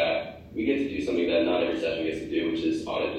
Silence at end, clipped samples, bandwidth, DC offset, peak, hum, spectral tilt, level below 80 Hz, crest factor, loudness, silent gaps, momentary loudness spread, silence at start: 0 s; under 0.1%; 9.4 kHz; under 0.1%; -12 dBFS; none; -5.5 dB/octave; -56 dBFS; 14 dB; -27 LUFS; none; 6 LU; 0 s